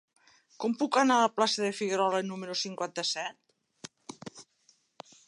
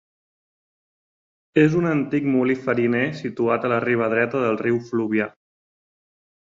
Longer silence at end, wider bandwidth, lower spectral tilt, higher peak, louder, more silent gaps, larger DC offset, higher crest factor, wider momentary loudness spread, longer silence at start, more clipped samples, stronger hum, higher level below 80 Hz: second, 0.85 s vs 1.2 s; first, 11.5 kHz vs 7.6 kHz; second, -3 dB/octave vs -8 dB/octave; second, -12 dBFS vs -4 dBFS; second, -29 LUFS vs -21 LUFS; neither; neither; about the same, 20 dB vs 18 dB; first, 22 LU vs 6 LU; second, 0.6 s vs 1.55 s; neither; neither; second, -82 dBFS vs -64 dBFS